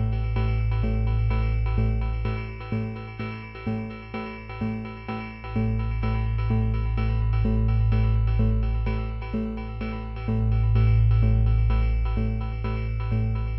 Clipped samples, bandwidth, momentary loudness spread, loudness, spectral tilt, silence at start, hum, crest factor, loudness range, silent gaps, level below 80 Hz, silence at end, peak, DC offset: under 0.1%; 5.6 kHz; 12 LU; -26 LUFS; -10.5 dB/octave; 0 s; none; 12 dB; 7 LU; none; -26 dBFS; 0 s; -10 dBFS; under 0.1%